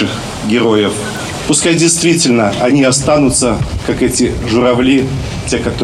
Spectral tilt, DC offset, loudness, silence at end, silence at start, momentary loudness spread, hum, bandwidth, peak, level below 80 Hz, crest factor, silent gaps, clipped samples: -4 dB/octave; under 0.1%; -12 LUFS; 0 s; 0 s; 8 LU; none; 14 kHz; 0 dBFS; -30 dBFS; 12 dB; none; under 0.1%